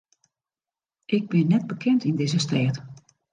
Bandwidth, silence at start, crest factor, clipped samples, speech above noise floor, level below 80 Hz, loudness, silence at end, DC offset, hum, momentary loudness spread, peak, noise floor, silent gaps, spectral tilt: 9.6 kHz; 1.1 s; 16 dB; under 0.1%; over 68 dB; -68 dBFS; -24 LUFS; 0.4 s; under 0.1%; none; 6 LU; -8 dBFS; under -90 dBFS; none; -6.5 dB/octave